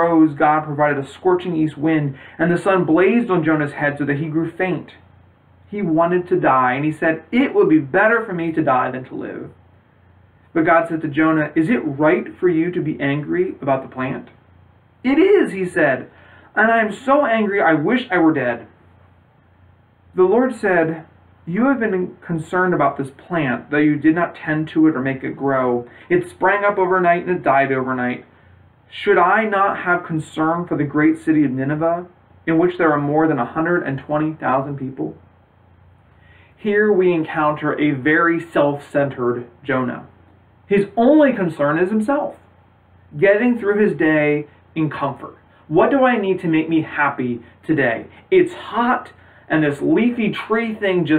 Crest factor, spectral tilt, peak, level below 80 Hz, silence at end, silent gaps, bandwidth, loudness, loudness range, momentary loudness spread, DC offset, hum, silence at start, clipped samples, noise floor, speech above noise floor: 16 dB; -8 dB/octave; -4 dBFS; -58 dBFS; 0 s; none; 10.5 kHz; -18 LUFS; 3 LU; 10 LU; under 0.1%; none; 0 s; under 0.1%; -52 dBFS; 35 dB